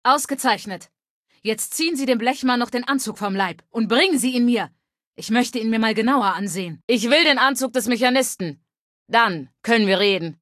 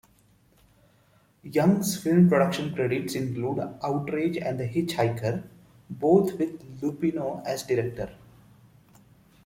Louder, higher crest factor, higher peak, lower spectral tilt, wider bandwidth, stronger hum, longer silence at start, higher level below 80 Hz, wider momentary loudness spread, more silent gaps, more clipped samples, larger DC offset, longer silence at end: first, -20 LUFS vs -26 LUFS; about the same, 18 dB vs 20 dB; first, -2 dBFS vs -8 dBFS; second, -3 dB/octave vs -6.5 dB/octave; second, 14.5 kHz vs 16.5 kHz; neither; second, 0.05 s vs 1.45 s; second, -68 dBFS vs -60 dBFS; about the same, 10 LU vs 11 LU; first, 1.10-1.25 s, 5.07-5.12 s, 6.83-6.88 s, 8.79-9.06 s vs none; neither; neither; second, 0.05 s vs 1.3 s